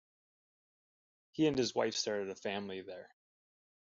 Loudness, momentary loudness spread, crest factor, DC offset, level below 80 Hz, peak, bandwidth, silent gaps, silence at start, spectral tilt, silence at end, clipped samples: -36 LUFS; 17 LU; 20 dB; under 0.1%; -74 dBFS; -18 dBFS; 7.8 kHz; none; 1.35 s; -3.5 dB/octave; 0.75 s; under 0.1%